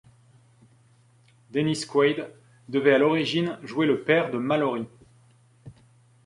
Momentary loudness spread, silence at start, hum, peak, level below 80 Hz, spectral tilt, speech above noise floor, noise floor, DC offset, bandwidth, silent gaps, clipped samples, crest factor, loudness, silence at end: 12 LU; 1.55 s; none; -6 dBFS; -68 dBFS; -5.5 dB/octave; 35 dB; -59 dBFS; under 0.1%; 11.5 kHz; none; under 0.1%; 20 dB; -24 LUFS; 0.55 s